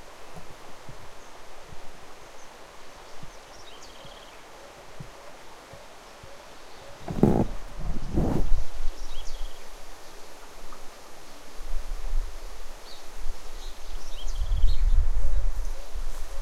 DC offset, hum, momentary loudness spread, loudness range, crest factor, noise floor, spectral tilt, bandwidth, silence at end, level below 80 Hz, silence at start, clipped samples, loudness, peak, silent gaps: under 0.1%; none; 18 LU; 16 LU; 20 dB; -45 dBFS; -6 dB/octave; 9.8 kHz; 0 s; -30 dBFS; 0 s; under 0.1%; -33 LUFS; -4 dBFS; none